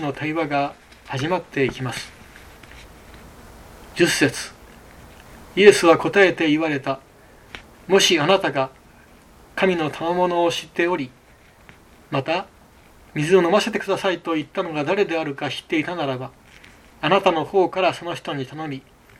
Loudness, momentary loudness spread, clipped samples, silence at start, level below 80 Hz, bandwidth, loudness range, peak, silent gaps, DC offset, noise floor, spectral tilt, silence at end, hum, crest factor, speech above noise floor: -20 LUFS; 16 LU; under 0.1%; 0 s; -54 dBFS; 15 kHz; 8 LU; 0 dBFS; none; under 0.1%; -51 dBFS; -4.5 dB/octave; 0.4 s; none; 22 dB; 31 dB